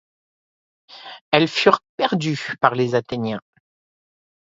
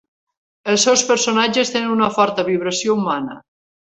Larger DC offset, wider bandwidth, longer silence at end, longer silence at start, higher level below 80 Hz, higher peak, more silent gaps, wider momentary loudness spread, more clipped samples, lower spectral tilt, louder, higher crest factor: neither; about the same, 7.8 kHz vs 8.4 kHz; first, 1 s vs 0.5 s; first, 0.9 s vs 0.65 s; about the same, -62 dBFS vs -60 dBFS; about the same, 0 dBFS vs -2 dBFS; first, 1.21-1.32 s, 1.89-1.98 s vs none; first, 18 LU vs 9 LU; neither; first, -5.5 dB/octave vs -2.5 dB/octave; second, -20 LUFS vs -17 LUFS; about the same, 22 dB vs 18 dB